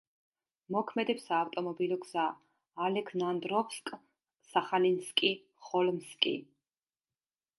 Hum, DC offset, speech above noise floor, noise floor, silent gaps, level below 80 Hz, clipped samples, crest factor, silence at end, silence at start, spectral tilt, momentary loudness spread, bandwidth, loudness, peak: none; under 0.1%; over 58 dB; under -90 dBFS; none; -86 dBFS; under 0.1%; 26 dB; 1.15 s; 0.7 s; -4.5 dB/octave; 12 LU; 11.5 kHz; -33 LUFS; -10 dBFS